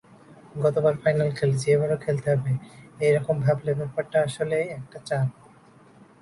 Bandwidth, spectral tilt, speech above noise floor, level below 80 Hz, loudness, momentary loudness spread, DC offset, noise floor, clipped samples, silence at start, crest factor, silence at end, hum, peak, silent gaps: 11.5 kHz; -7 dB/octave; 29 dB; -58 dBFS; -25 LUFS; 8 LU; under 0.1%; -53 dBFS; under 0.1%; 0.3 s; 16 dB; 0.9 s; none; -8 dBFS; none